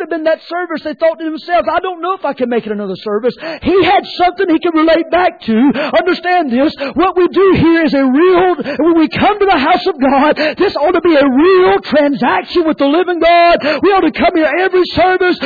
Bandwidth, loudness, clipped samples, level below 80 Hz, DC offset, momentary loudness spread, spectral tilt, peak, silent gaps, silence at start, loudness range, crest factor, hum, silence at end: 4.9 kHz; -12 LUFS; under 0.1%; -42 dBFS; under 0.1%; 8 LU; -7.5 dB/octave; -2 dBFS; none; 0 s; 4 LU; 8 dB; none; 0 s